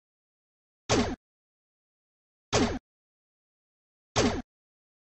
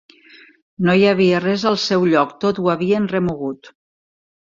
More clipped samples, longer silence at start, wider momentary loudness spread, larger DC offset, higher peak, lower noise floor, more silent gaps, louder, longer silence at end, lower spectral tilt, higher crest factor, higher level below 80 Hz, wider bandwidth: neither; about the same, 0.9 s vs 0.8 s; first, 13 LU vs 9 LU; neither; second, -12 dBFS vs -2 dBFS; first, under -90 dBFS vs -47 dBFS; first, 1.17-2.52 s, 2.80-4.15 s vs none; second, -29 LUFS vs -17 LUFS; second, 0.75 s vs 0.9 s; second, -4 dB/octave vs -6 dB/octave; first, 22 dB vs 16 dB; first, -48 dBFS vs -54 dBFS; first, 11.5 kHz vs 7.6 kHz